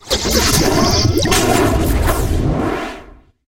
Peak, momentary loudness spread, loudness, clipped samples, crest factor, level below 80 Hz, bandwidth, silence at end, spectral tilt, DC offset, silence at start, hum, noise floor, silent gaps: 0 dBFS; 8 LU; -15 LUFS; under 0.1%; 16 dB; -22 dBFS; 17 kHz; 0.4 s; -4 dB/octave; under 0.1%; 0.05 s; none; -39 dBFS; none